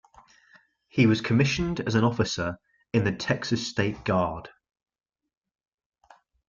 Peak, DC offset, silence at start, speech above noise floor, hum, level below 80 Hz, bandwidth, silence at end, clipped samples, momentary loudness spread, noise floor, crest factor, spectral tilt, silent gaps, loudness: -8 dBFS; under 0.1%; 0.95 s; 35 dB; none; -52 dBFS; 7.4 kHz; 2 s; under 0.1%; 9 LU; -60 dBFS; 20 dB; -6 dB/octave; none; -26 LUFS